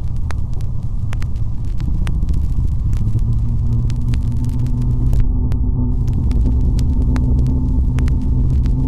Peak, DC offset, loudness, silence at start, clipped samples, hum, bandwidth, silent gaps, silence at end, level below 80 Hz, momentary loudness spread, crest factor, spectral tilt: -2 dBFS; 6%; -19 LUFS; 0 s; under 0.1%; none; 9.2 kHz; none; 0 s; -18 dBFS; 7 LU; 12 dB; -9 dB/octave